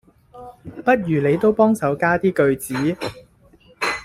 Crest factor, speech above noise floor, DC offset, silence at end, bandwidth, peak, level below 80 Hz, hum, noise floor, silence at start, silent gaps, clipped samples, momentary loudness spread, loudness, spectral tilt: 18 dB; 33 dB; under 0.1%; 0 s; 15.5 kHz; -2 dBFS; -52 dBFS; none; -52 dBFS; 0.35 s; none; under 0.1%; 13 LU; -19 LUFS; -6 dB/octave